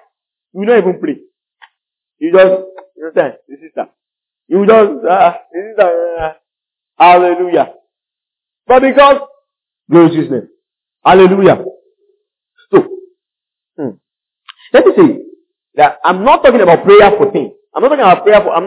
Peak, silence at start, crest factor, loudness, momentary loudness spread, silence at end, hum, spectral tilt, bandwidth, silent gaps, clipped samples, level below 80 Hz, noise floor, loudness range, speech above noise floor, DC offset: 0 dBFS; 0.55 s; 10 dB; -9 LUFS; 18 LU; 0 s; none; -10 dB/octave; 4 kHz; none; 0.9%; -48 dBFS; -83 dBFS; 6 LU; 75 dB; under 0.1%